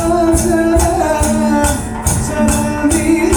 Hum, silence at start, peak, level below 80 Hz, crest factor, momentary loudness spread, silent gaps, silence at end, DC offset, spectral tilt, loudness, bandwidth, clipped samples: none; 0 s; 0 dBFS; -22 dBFS; 12 dB; 4 LU; none; 0 s; under 0.1%; -5 dB/octave; -13 LUFS; over 20 kHz; under 0.1%